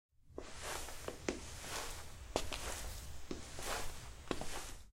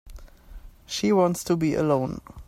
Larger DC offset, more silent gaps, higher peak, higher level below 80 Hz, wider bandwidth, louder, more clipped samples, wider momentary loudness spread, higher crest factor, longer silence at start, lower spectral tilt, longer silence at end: neither; neither; second, -18 dBFS vs -10 dBFS; second, -52 dBFS vs -46 dBFS; about the same, 16 kHz vs 16 kHz; second, -45 LUFS vs -24 LUFS; neither; about the same, 8 LU vs 9 LU; first, 26 dB vs 16 dB; first, 0.2 s vs 0.05 s; second, -3 dB/octave vs -6 dB/octave; about the same, 0 s vs 0.05 s